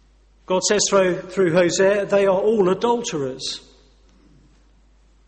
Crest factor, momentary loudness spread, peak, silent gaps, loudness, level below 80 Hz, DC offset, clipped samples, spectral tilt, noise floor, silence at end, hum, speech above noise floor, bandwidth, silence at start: 16 dB; 9 LU; -4 dBFS; none; -19 LUFS; -54 dBFS; under 0.1%; under 0.1%; -3.5 dB/octave; -54 dBFS; 1.7 s; none; 36 dB; 8.8 kHz; 0.5 s